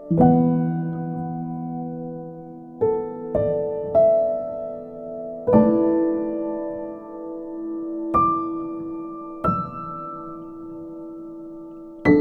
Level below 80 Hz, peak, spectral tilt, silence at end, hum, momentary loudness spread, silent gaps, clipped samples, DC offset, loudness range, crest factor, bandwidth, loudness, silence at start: -50 dBFS; -2 dBFS; -11 dB/octave; 0 s; none; 19 LU; none; under 0.1%; under 0.1%; 6 LU; 20 dB; 4.5 kHz; -23 LUFS; 0 s